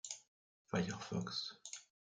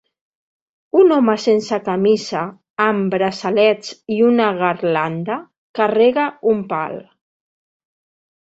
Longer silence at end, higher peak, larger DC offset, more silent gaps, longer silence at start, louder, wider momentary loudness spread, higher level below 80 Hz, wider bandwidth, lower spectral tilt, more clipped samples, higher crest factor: second, 0.3 s vs 1.45 s; second, -24 dBFS vs -2 dBFS; neither; first, 0.28-0.65 s vs 2.70-2.76 s, 5.58-5.74 s; second, 0.05 s vs 0.95 s; second, -44 LUFS vs -17 LUFS; about the same, 11 LU vs 11 LU; second, -78 dBFS vs -64 dBFS; first, 9.6 kHz vs 8 kHz; second, -4 dB/octave vs -6 dB/octave; neither; first, 22 dB vs 16 dB